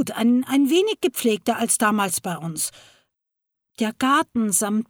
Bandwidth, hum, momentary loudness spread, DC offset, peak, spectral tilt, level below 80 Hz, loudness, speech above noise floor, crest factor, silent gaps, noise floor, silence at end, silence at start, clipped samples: 19.5 kHz; none; 8 LU; under 0.1%; -6 dBFS; -3.5 dB/octave; -66 dBFS; -21 LUFS; 61 dB; 16 dB; none; -82 dBFS; 0.05 s; 0 s; under 0.1%